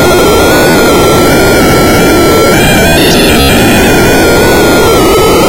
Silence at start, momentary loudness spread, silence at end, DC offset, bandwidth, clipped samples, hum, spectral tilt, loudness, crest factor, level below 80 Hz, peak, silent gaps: 0 s; 0 LU; 0 s; under 0.1%; 17 kHz; under 0.1%; none; -4 dB/octave; -5 LUFS; 4 dB; -18 dBFS; 0 dBFS; none